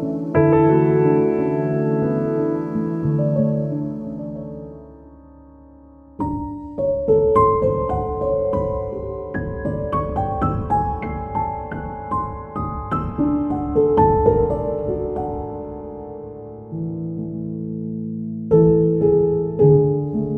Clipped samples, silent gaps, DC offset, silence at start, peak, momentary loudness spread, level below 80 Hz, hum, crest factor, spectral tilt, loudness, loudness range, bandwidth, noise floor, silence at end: under 0.1%; none; under 0.1%; 0 s; -2 dBFS; 14 LU; -36 dBFS; none; 18 dB; -11.5 dB/octave; -20 LUFS; 9 LU; 3.3 kHz; -45 dBFS; 0 s